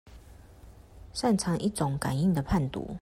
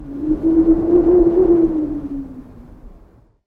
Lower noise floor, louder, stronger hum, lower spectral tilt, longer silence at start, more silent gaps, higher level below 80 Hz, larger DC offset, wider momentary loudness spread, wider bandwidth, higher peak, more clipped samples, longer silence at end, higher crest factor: about the same, -51 dBFS vs -48 dBFS; second, -29 LUFS vs -15 LUFS; neither; second, -6 dB/octave vs -11 dB/octave; about the same, 0.05 s vs 0 s; neither; second, -46 dBFS vs -34 dBFS; neither; second, 5 LU vs 15 LU; first, 16 kHz vs 2.4 kHz; second, -14 dBFS vs -2 dBFS; neither; second, 0.05 s vs 0.55 s; about the same, 16 dB vs 14 dB